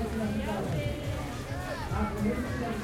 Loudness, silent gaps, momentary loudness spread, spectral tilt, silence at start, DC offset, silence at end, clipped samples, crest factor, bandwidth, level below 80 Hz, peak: -33 LUFS; none; 5 LU; -6.5 dB/octave; 0 s; under 0.1%; 0 s; under 0.1%; 14 dB; 16.5 kHz; -42 dBFS; -18 dBFS